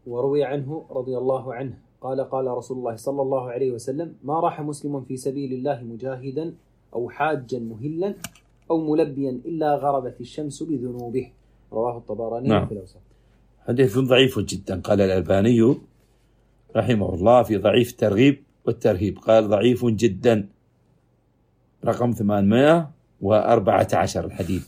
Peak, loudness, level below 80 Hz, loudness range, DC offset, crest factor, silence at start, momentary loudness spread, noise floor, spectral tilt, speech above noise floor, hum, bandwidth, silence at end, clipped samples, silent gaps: -4 dBFS; -22 LUFS; -54 dBFS; 8 LU; under 0.1%; 20 dB; 0.05 s; 14 LU; -63 dBFS; -6.5 dB/octave; 41 dB; none; 16 kHz; 0.05 s; under 0.1%; none